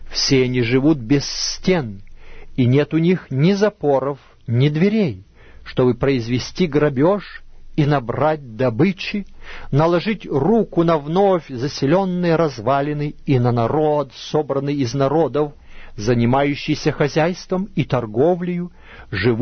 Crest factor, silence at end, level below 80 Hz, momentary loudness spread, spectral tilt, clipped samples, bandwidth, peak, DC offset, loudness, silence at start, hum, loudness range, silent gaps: 16 dB; 0 s; -40 dBFS; 9 LU; -6.5 dB/octave; under 0.1%; 6.6 kHz; -4 dBFS; under 0.1%; -19 LUFS; 0 s; none; 2 LU; none